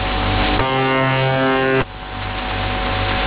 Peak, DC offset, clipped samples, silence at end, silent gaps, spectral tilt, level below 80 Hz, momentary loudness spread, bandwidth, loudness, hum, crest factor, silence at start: -6 dBFS; under 0.1%; under 0.1%; 0 s; none; -9.5 dB/octave; -28 dBFS; 8 LU; 4 kHz; -18 LUFS; none; 12 dB; 0 s